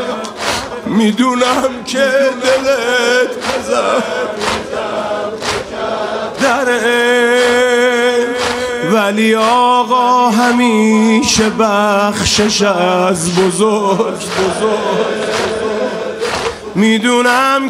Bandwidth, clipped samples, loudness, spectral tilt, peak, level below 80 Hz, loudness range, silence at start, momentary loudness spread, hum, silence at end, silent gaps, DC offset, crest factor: 16 kHz; under 0.1%; -13 LUFS; -3.5 dB/octave; 0 dBFS; -44 dBFS; 5 LU; 0 s; 8 LU; none; 0 s; none; under 0.1%; 12 dB